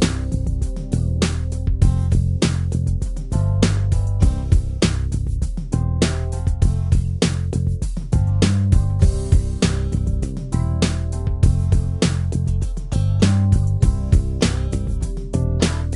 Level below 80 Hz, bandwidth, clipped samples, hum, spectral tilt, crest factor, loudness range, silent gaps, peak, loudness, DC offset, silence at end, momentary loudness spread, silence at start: -22 dBFS; 11.5 kHz; under 0.1%; none; -6 dB/octave; 16 dB; 2 LU; none; -2 dBFS; -20 LUFS; under 0.1%; 0 s; 7 LU; 0 s